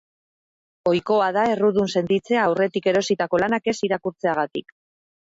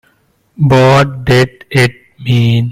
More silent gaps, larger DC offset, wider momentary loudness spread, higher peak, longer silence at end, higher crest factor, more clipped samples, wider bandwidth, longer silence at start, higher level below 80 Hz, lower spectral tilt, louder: neither; neither; second, 5 LU vs 8 LU; second, -8 dBFS vs 0 dBFS; first, 0.65 s vs 0 s; about the same, 14 dB vs 12 dB; neither; second, 8 kHz vs 15 kHz; first, 0.85 s vs 0.6 s; second, -60 dBFS vs -38 dBFS; about the same, -5.5 dB/octave vs -6.5 dB/octave; second, -21 LUFS vs -11 LUFS